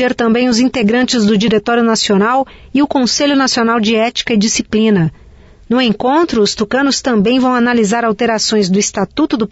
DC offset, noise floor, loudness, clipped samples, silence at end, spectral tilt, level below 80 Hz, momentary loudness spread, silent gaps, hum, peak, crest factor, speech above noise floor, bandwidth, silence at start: under 0.1%; -40 dBFS; -13 LUFS; under 0.1%; 0.05 s; -4 dB/octave; -44 dBFS; 4 LU; none; none; -2 dBFS; 10 dB; 28 dB; 8 kHz; 0 s